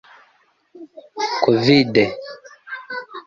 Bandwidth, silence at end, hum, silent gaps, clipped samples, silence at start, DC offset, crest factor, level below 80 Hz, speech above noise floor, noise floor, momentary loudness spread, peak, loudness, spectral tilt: 7.4 kHz; 0.05 s; none; none; under 0.1%; 0.75 s; under 0.1%; 20 dB; -58 dBFS; 42 dB; -60 dBFS; 23 LU; -2 dBFS; -17 LUFS; -6 dB/octave